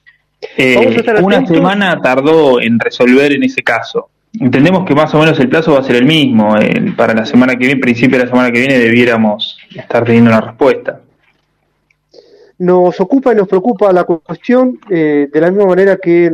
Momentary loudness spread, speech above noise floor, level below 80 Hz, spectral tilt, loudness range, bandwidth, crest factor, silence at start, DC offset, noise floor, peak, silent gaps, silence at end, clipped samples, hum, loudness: 7 LU; 51 dB; -50 dBFS; -7 dB/octave; 4 LU; 12 kHz; 10 dB; 0.4 s; under 0.1%; -60 dBFS; 0 dBFS; none; 0 s; under 0.1%; 50 Hz at -45 dBFS; -10 LUFS